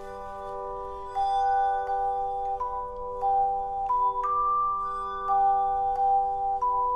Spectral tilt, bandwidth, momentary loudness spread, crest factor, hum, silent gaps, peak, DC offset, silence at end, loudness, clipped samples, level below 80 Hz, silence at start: -5 dB/octave; 8.4 kHz; 11 LU; 10 dB; none; none; -16 dBFS; under 0.1%; 0 s; -27 LUFS; under 0.1%; -48 dBFS; 0 s